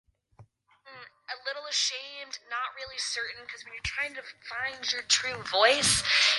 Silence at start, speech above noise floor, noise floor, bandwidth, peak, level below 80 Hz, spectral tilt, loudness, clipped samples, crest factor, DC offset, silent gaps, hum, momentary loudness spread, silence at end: 0.4 s; 29 dB; -58 dBFS; 12 kHz; -8 dBFS; -58 dBFS; 0 dB/octave; -28 LUFS; under 0.1%; 22 dB; under 0.1%; none; none; 19 LU; 0 s